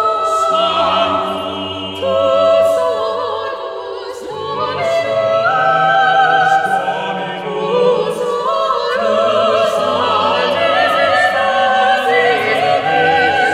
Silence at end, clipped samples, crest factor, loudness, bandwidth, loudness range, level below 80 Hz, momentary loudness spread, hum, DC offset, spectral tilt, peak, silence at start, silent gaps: 0 s; under 0.1%; 12 dB; -14 LUFS; 14.5 kHz; 4 LU; -56 dBFS; 10 LU; none; under 0.1%; -4 dB/octave; -2 dBFS; 0 s; none